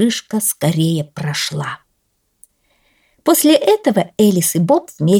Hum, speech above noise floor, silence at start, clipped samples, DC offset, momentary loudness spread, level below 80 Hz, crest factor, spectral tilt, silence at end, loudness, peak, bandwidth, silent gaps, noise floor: none; 51 dB; 0 s; under 0.1%; under 0.1%; 10 LU; -60 dBFS; 14 dB; -5 dB/octave; 0 s; -15 LUFS; -2 dBFS; 19 kHz; none; -66 dBFS